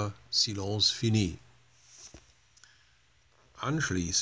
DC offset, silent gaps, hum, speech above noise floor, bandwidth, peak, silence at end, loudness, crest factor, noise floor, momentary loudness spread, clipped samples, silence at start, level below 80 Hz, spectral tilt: under 0.1%; none; none; 36 dB; 8 kHz; -12 dBFS; 0 s; -29 LUFS; 20 dB; -66 dBFS; 24 LU; under 0.1%; 0 s; -52 dBFS; -3.5 dB/octave